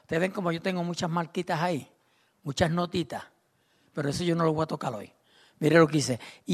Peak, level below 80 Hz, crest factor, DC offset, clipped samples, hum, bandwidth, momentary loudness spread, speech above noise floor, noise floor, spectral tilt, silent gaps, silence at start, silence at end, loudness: -6 dBFS; -60 dBFS; 22 dB; under 0.1%; under 0.1%; none; 13.5 kHz; 14 LU; 41 dB; -68 dBFS; -5.5 dB/octave; none; 0.1 s; 0 s; -28 LUFS